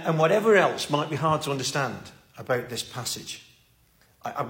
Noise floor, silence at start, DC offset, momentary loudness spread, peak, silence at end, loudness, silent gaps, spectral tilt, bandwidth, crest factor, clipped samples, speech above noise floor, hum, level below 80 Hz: -61 dBFS; 0 s; under 0.1%; 20 LU; -8 dBFS; 0 s; -25 LUFS; none; -4.5 dB/octave; 16.5 kHz; 18 dB; under 0.1%; 36 dB; none; -64 dBFS